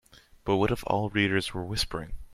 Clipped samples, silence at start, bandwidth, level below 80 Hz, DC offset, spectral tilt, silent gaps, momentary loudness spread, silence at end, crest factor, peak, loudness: under 0.1%; 0.45 s; 15.5 kHz; -44 dBFS; under 0.1%; -5 dB/octave; none; 8 LU; 0 s; 20 dB; -10 dBFS; -28 LUFS